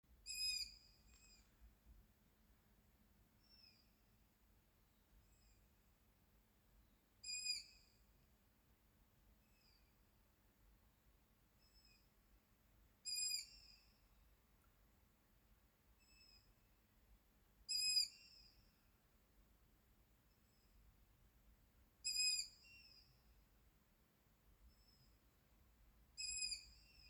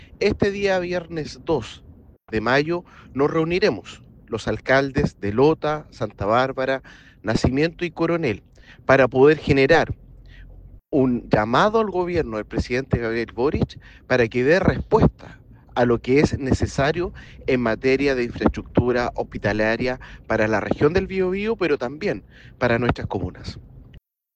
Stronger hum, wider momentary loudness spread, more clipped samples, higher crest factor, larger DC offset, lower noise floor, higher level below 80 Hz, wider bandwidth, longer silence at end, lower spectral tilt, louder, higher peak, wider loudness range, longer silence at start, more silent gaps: neither; first, 25 LU vs 11 LU; neither; first, 24 dB vs 18 dB; neither; first, -77 dBFS vs -49 dBFS; second, -76 dBFS vs -38 dBFS; first, over 20 kHz vs 9.2 kHz; second, 0 s vs 0.4 s; second, 2 dB/octave vs -6.5 dB/octave; second, -43 LUFS vs -21 LUFS; second, -30 dBFS vs -4 dBFS; first, 9 LU vs 4 LU; about the same, 0.1 s vs 0 s; neither